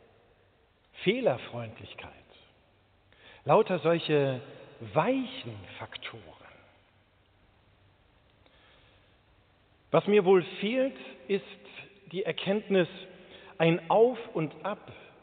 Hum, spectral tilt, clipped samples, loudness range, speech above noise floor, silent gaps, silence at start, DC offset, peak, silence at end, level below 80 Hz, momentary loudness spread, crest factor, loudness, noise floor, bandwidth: none; -4.5 dB/octave; under 0.1%; 9 LU; 37 dB; none; 0.95 s; under 0.1%; -10 dBFS; 0.25 s; -70 dBFS; 22 LU; 22 dB; -29 LUFS; -66 dBFS; 4.6 kHz